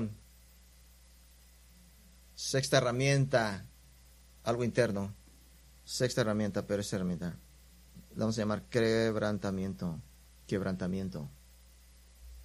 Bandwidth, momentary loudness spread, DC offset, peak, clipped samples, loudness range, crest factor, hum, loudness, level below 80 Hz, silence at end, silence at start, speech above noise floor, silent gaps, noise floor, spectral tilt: 15.5 kHz; 18 LU; under 0.1%; -12 dBFS; under 0.1%; 4 LU; 22 dB; none; -33 LUFS; -58 dBFS; 0 s; 0 s; 27 dB; none; -59 dBFS; -5.5 dB/octave